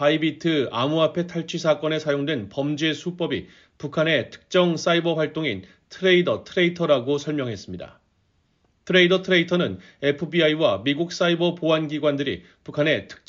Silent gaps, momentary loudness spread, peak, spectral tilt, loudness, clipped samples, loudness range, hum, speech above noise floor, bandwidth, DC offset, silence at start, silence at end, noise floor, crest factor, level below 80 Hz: none; 9 LU; -4 dBFS; -4 dB/octave; -22 LUFS; under 0.1%; 3 LU; none; 44 dB; 7.6 kHz; under 0.1%; 0 s; 0.15 s; -66 dBFS; 18 dB; -64 dBFS